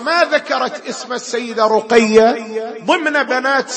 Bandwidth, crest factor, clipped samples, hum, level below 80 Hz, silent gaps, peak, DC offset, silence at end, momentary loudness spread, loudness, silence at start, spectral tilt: 8.8 kHz; 16 dB; under 0.1%; none; -56 dBFS; none; 0 dBFS; under 0.1%; 0 s; 12 LU; -15 LUFS; 0 s; -3 dB/octave